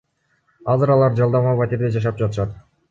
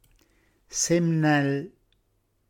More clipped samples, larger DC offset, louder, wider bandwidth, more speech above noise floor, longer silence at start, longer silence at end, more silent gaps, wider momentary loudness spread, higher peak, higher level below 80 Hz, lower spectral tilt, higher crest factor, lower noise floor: neither; neither; first, -19 LUFS vs -24 LUFS; second, 7.4 kHz vs 17 kHz; about the same, 47 dB vs 47 dB; about the same, 0.65 s vs 0.7 s; second, 0.3 s vs 0.8 s; neither; about the same, 10 LU vs 11 LU; first, -6 dBFS vs -10 dBFS; first, -46 dBFS vs -64 dBFS; first, -9.5 dB/octave vs -5 dB/octave; about the same, 14 dB vs 16 dB; second, -65 dBFS vs -70 dBFS